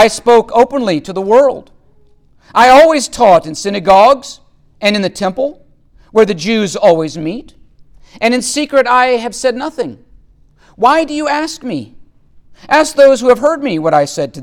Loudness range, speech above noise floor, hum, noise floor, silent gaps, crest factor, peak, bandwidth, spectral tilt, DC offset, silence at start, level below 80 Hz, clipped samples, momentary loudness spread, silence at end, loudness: 5 LU; 35 dB; none; -46 dBFS; none; 12 dB; 0 dBFS; 16.5 kHz; -4 dB/octave; under 0.1%; 0 s; -44 dBFS; under 0.1%; 13 LU; 0 s; -11 LUFS